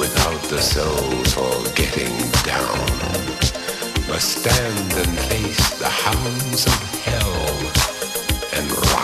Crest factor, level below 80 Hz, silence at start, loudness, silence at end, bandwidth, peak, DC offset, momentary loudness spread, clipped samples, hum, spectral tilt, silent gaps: 16 dB; -28 dBFS; 0 s; -19 LUFS; 0 s; 15.5 kHz; -2 dBFS; under 0.1%; 4 LU; under 0.1%; none; -3.5 dB/octave; none